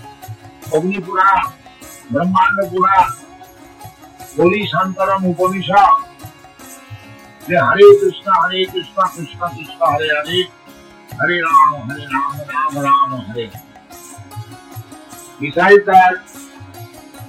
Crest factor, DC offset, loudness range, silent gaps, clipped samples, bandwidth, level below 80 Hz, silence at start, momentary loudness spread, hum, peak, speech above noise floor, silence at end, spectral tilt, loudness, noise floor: 16 dB; under 0.1%; 5 LU; none; 0.1%; 16 kHz; -52 dBFS; 0.05 s; 25 LU; none; 0 dBFS; 27 dB; 0 s; -5 dB/octave; -14 LUFS; -41 dBFS